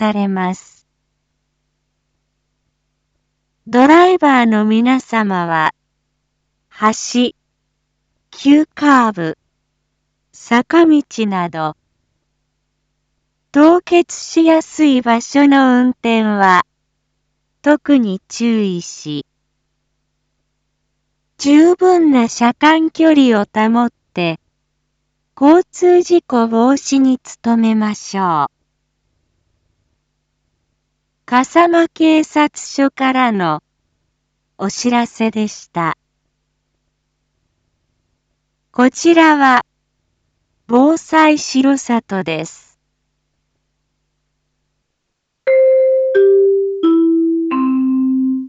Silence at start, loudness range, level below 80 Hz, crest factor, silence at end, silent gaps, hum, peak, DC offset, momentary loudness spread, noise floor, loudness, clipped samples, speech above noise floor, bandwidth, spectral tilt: 0 s; 9 LU; -62 dBFS; 14 dB; 0 s; none; none; 0 dBFS; under 0.1%; 11 LU; -73 dBFS; -13 LUFS; under 0.1%; 60 dB; 8.2 kHz; -5 dB/octave